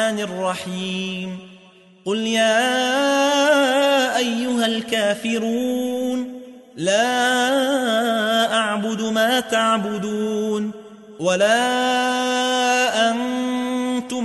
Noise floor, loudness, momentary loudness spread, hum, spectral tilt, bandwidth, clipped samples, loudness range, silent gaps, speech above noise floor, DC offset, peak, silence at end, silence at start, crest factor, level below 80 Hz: -48 dBFS; -19 LUFS; 9 LU; none; -3 dB/octave; 12 kHz; under 0.1%; 3 LU; none; 29 dB; under 0.1%; -6 dBFS; 0 s; 0 s; 14 dB; -68 dBFS